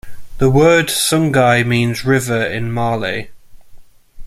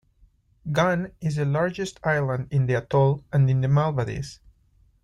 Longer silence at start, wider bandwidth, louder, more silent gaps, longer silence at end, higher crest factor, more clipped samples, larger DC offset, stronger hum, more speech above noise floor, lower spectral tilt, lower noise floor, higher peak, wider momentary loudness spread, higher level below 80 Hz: second, 0.05 s vs 0.65 s; first, 15.5 kHz vs 10 kHz; first, -14 LUFS vs -24 LUFS; neither; second, 0 s vs 0.7 s; about the same, 14 dB vs 16 dB; neither; neither; neither; second, 23 dB vs 38 dB; second, -5 dB/octave vs -7.5 dB/octave; second, -37 dBFS vs -61 dBFS; first, -2 dBFS vs -8 dBFS; about the same, 8 LU vs 8 LU; first, -38 dBFS vs -52 dBFS